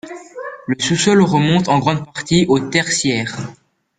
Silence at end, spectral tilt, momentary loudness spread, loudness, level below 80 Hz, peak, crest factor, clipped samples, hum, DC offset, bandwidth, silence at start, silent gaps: 0.45 s; -4.5 dB/octave; 17 LU; -16 LUFS; -50 dBFS; -2 dBFS; 16 dB; under 0.1%; none; under 0.1%; 9.6 kHz; 0.05 s; none